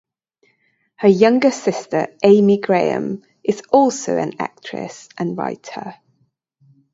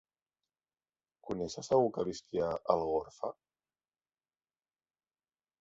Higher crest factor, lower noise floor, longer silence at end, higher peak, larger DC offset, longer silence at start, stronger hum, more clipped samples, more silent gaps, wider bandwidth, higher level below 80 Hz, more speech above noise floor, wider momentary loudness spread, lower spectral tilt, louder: second, 18 dB vs 24 dB; second, -65 dBFS vs under -90 dBFS; second, 1 s vs 2.3 s; first, 0 dBFS vs -12 dBFS; neither; second, 1 s vs 1.25 s; neither; neither; neither; about the same, 8 kHz vs 8 kHz; about the same, -66 dBFS vs -66 dBFS; second, 48 dB vs over 57 dB; first, 17 LU vs 13 LU; about the same, -6 dB/octave vs -6 dB/octave; first, -17 LUFS vs -34 LUFS